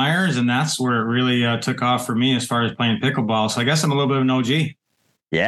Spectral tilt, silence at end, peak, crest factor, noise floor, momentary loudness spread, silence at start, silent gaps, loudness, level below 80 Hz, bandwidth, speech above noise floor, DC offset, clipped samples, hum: -5 dB/octave; 0 s; -6 dBFS; 12 dB; -68 dBFS; 3 LU; 0 s; none; -20 LUFS; -62 dBFS; 12.5 kHz; 49 dB; under 0.1%; under 0.1%; none